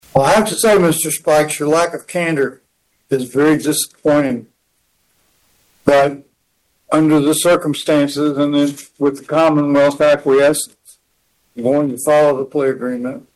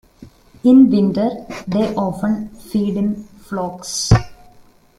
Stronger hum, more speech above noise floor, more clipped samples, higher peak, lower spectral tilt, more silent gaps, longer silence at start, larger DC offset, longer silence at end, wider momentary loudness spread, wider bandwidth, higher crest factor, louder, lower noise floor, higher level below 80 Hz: neither; first, 50 dB vs 32 dB; neither; about the same, 0 dBFS vs 0 dBFS; second, -4.5 dB/octave vs -6 dB/octave; neither; about the same, 0.15 s vs 0.2 s; neither; second, 0.15 s vs 0.65 s; second, 9 LU vs 14 LU; about the same, 13 kHz vs 13.5 kHz; about the same, 16 dB vs 16 dB; about the same, -15 LUFS vs -17 LUFS; first, -64 dBFS vs -48 dBFS; second, -52 dBFS vs -36 dBFS